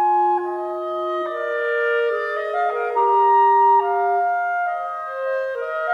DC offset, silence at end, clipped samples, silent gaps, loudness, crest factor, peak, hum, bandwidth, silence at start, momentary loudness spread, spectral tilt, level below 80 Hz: under 0.1%; 0 s; under 0.1%; none; -20 LUFS; 12 dB; -8 dBFS; none; 6.8 kHz; 0 s; 11 LU; -4 dB/octave; -80 dBFS